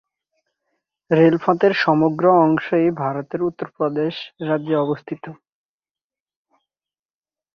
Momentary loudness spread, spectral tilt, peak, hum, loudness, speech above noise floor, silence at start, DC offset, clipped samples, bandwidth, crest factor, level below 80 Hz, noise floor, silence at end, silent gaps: 12 LU; -8.5 dB/octave; -2 dBFS; none; -19 LUFS; over 72 dB; 1.1 s; under 0.1%; under 0.1%; 6.4 kHz; 18 dB; -64 dBFS; under -90 dBFS; 2.2 s; none